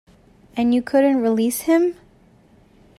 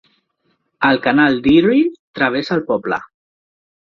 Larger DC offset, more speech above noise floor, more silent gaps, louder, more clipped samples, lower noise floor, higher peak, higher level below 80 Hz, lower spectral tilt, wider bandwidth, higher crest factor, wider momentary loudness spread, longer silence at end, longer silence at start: neither; second, 35 dB vs 51 dB; second, none vs 1.99-2.14 s; second, -19 LUFS vs -16 LUFS; neither; second, -53 dBFS vs -66 dBFS; second, -6 dBFS vs -2 dBFS; second, -58 dBFS vs -52 dBFS; second, -5 dB/octave vs -7 dB/octave; first, 15 kHz vs 6.6 kHz; about the same, 14 dB vs 16 dB; second, 6 LU vs 9 LU; about the same, 1.05 s vs 0.95 s; second, 0.55 s vs 0.8 s